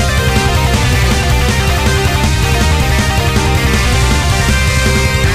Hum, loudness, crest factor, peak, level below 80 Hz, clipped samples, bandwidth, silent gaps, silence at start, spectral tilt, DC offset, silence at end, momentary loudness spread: none; -12 LUFS; 10 dB; 0 dBFS; -16 dBFS; under 0.1%; 15.5 kHz; none; 0 s; -4.5 dB/octave; 0.2%; 0 s; 1 LU